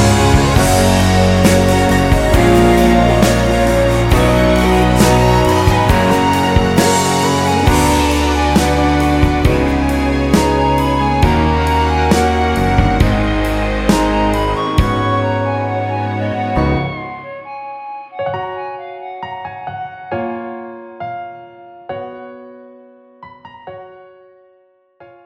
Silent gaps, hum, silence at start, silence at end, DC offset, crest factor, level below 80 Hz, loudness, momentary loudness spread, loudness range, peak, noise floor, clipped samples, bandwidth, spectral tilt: none; none; 0 s; 0.2 s; under 0.1%; 14 dB; -22 dBFS; -13 LUFS; 17 LU; 16 LU; 0 dBFS; -54 dBFS; under 0.1%; 16.5 kHz; -5.5 dB/octave